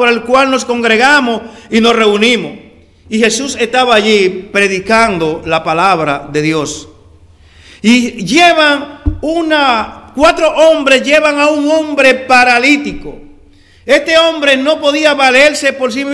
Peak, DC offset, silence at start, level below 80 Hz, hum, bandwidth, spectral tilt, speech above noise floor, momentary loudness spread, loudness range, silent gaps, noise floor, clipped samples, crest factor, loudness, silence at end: 0 dBFS; under 0.1%; 0 s; -36 dBFS; none; 12 kHz; -3.5 dB/octave; 32 dB; 9 LU; 3 LU; none; -42 dBFS; 1%; 10 dB; -10 LUFS; 0 s